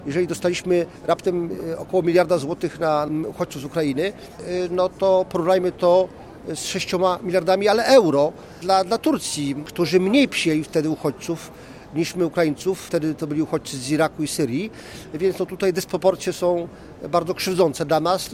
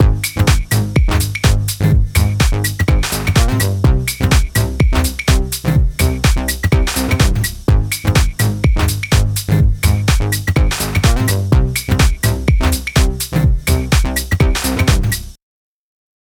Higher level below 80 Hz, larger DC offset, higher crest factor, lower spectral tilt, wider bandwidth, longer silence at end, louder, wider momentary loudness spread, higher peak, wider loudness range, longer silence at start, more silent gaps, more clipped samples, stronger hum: second, -54 dBFS vs -18 dBFS; neither; about the same, 18 dB vs 14 dB; about the same, -5 dB/octave vs -5 dB/octave; second, 16.5 kHz vs over 20 kHz; second, 0 s vs 0.95 s; second, -21 LUFS vs -15 LUFS; first, 11 LU vs 2 LU; second, -4 dBFS vs 0 dBFS; first, 5 LU vs 1 LU; about the same, 0 s vs 0 s; neither; neither; neither